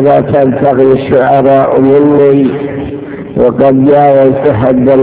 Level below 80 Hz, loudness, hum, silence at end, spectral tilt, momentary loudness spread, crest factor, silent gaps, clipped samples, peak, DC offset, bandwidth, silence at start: -36 dBFS; -7 LUFS; none; 0 s; -12 dB/octave; 11 LU; 6 dB; none; 4%; 0 dBFS; 0.2%; 4 kHz; 0 s